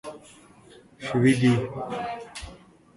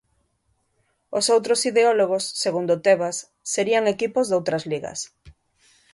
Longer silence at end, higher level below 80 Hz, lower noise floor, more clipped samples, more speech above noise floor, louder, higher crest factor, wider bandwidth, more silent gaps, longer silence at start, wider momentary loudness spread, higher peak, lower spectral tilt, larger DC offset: second, 0.4 s vs 0.65 s; first, -54 dBFS vs -62 dBFS; second, -52 dBFS vs -69 dBFS; neither; second, 29 dB vs 48 dB; about the same, -24 LUFS vs -22 LUFS; about the same, 18 dB vs 18 dB; about the same, 11.5 kHz vs 11.5 kHz; neither; second, 0.05 s vs 1.1 s; first, 23 LU vs 11 LU; second, -8 dBFS vs -4 dBFS; first, -6.5 dB/octave vs -3 dB/octave; neither